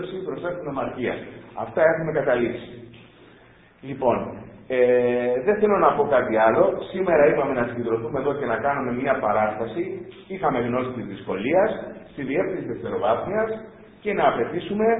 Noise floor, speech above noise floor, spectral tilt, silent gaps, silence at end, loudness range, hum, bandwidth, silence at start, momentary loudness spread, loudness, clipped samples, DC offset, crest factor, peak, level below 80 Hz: -52 dBFS; 29 dB; -11 dB/octave; none; 0 s; 6 LU; none; 4 kHz; 0 s; 15 LU; -23 LUFS; under 0.1%; under 0.1%; 20 dB; -4 dBFS; -54 dBFS